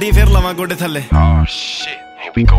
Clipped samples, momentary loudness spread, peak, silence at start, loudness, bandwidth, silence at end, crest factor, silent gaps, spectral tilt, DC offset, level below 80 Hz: under 0.1%; 11 LU; 0 dBFS; 0 s; -15 LUFS; 16 kHz; 0 s; 12 dB; none; -6 dB/octave; under 0.1%; -14 dBFS